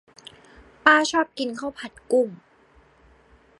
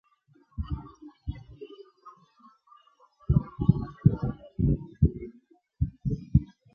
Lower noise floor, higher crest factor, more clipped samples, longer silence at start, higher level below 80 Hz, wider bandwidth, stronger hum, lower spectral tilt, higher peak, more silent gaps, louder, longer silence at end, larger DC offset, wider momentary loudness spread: second, -57 dBFS vs -64 dBFS; about the same, 24 dB vs 24 dB; neither; first, 0.85 s vs 0.6 s; second, -62 dBFS vs -38 dBFS; first, 11.5 kHz vs 5 kHz; neither; second, -2.5 dB/octave vs -12 dB/octave; first, -2 dBFS vs -6 dBFS; neither; first, -22 LUFS vs -29 LUFS; first, 1.25 s vs 0.3 s; neither; second, 16 LU vs 20 LU